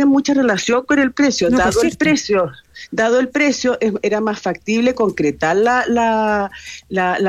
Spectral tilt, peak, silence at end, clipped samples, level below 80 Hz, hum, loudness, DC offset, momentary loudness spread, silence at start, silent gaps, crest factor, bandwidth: -4.5 dB/octave; -4 dBFS; 0 s; under 0.1%; -44 dBFS; none; -16 LUFS; under 0.1%; 7 LU; 0 s; none; 12 dB; 13.5 kHz